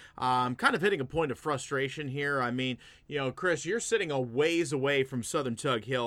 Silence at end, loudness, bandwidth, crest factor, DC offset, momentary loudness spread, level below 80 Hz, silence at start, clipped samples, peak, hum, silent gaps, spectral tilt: 0 s; -30 LUFS; 15 kHz; 20 dB; under 0.1%; 6 LU; -62 dBFS; 0 s; under 0.1%; -10 dBFS; none; none; -4.5 dB/octave